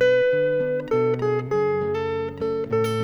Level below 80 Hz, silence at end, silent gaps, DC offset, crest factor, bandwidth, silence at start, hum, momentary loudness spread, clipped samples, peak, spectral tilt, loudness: -56 dBFS; 0 s; none; under 0.1%; 12 dB; over 20 kHz; 0 s; none; 7 LU; under 0.1%; -10 dBFS; -6.5 dB/octave; -23 LUFS